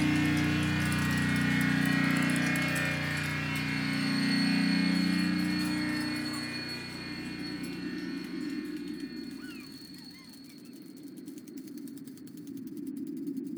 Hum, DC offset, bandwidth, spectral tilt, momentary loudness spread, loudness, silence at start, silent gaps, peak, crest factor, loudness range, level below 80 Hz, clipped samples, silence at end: none; under 0.1%; over 20 kHz; -5 dB/octave; 18 LU; -30 LUFS; 0 s; none; -16 dBFS; 16 dB; 15 LU; -68 dBFS; under 0.1%; 0 s